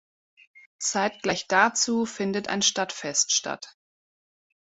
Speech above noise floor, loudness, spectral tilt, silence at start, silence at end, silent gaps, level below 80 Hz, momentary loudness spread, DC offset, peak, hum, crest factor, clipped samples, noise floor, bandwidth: over 64 dB; -24 LUFS; -1.5 dB/octave; 0.8 s; 1 s; none; -68 dBFS; 9 LU; under 0.1%; -4 dBFS; none; 24 dB; under 0.1%; under -90 dBFS; 8.4 kHz